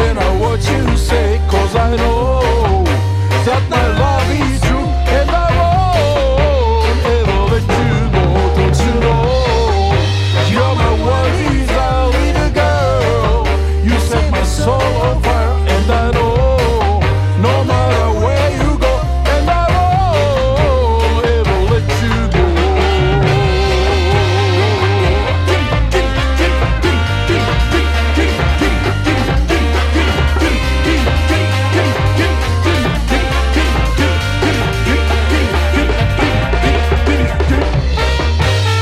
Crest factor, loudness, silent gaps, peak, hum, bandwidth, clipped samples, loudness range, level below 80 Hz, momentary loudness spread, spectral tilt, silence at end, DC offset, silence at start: 12 dB; -13 LUFS; none; 0 dBFS; none; 13.5 kHz; under 0.1%; 1 LU; -16 dBFS; 2 LU; -6 dB/octave; 0 s; under 0.1%; 0 s